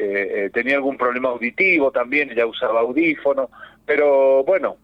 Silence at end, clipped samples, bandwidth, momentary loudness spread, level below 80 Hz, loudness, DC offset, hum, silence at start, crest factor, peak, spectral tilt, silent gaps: 0.1 s; under 0.1%; 5.4 kHz; 7 LU; -62 dBFS; -18 LUFS; under 0.1%; none; 0 s; 12 dB; -6 dBFS; -6.5 dB/octave; none